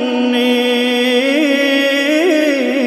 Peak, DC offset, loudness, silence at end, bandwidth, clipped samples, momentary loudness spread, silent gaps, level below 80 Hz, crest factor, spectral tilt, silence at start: -2 dBFS; under 0.1%; -13 LUFS; 0 s; 14 kHz; under 0.1%; 1 LU; none; -82 dBFS; 12 dB; -2.5 dB/octave; 0 s